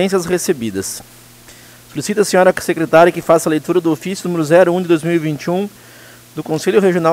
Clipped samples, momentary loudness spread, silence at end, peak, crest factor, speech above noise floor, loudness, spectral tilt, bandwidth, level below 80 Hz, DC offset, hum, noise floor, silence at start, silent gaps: under 0.1%; 13 LU; 0 s; 0 dBFS; 16 dB; 26 dB; -15 LUFS; -5 dB/octave; 16 kHz; -54 dBFS; under 0.1%; none; -41 dBFS; 0 s; none